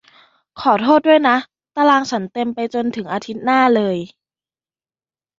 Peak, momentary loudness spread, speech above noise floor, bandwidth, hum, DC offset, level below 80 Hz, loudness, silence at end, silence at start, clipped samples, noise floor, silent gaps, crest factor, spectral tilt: 0 dBFS; 12 LU; over 74 dB; 7.6 kHz; none; under 0.1%; -62 dBFS; -17 LUFS; 1.35 s; 0.55 s; under 0.1%; under -90 dBFS; none; 18 dB; -5.5 dB/octave